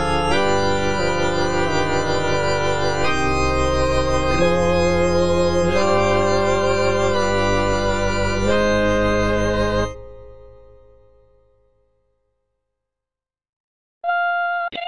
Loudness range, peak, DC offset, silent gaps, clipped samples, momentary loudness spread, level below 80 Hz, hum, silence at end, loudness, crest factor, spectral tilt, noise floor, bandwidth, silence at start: 9 LU; -6 dBFS; under 0.1%; 13.49-14.01 s; under 0.1%; 3 LU; -32 dBFS; none; 0 s; -19 LUFS; 14 dB; -5 dB/octave; -89 dBFS; 10 kHz; 0 s